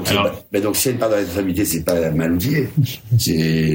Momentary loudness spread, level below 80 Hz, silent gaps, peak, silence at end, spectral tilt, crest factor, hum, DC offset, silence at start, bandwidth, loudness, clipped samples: 3 LU; -46 dBFS; none; -2 dBFS; 0 s; -5 dB/octave; 16 dB; none; under 0.1%; 0 s; 16.5 kHz; -19 LUFS; under 0.1%